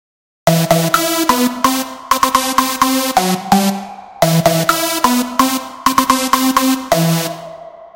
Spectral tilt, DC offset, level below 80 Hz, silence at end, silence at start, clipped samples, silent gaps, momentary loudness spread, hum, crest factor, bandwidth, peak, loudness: -4 dB/octave; 0.2%; -46 dBFS; 0.05 s; 0.45 s; 0.1%; none; 6 LU; none; 14 dB; 17.5 kHz; 0 dBFS; -14 LUFS